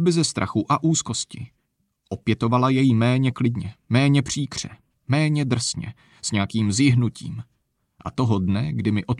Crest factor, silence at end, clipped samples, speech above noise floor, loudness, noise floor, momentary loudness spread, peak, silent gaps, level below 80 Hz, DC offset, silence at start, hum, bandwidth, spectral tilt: 16 dB; 0 s; under 0.1%; 50 dB; -22 LUFS; -71 dBFS; 16 LU; -6 dBFS; none; -52 dBFS; under 0.1%; 0 s; none; 11 kHz; -5.5 dB/octave